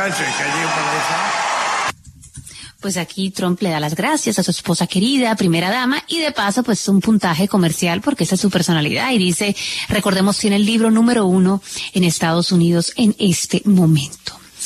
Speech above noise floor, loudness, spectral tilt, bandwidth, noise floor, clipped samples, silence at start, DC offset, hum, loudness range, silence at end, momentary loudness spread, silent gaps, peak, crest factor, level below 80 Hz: 22 dB; -17 LUFS; -4.5 dB/octave; 13.5 kHz; -39 dBFS; under 0.1%; 0 s; under 0.1%; none; 5 LU; 0 s; 8 LU; none; -2 dBFS; 14 dB; -50 dBFS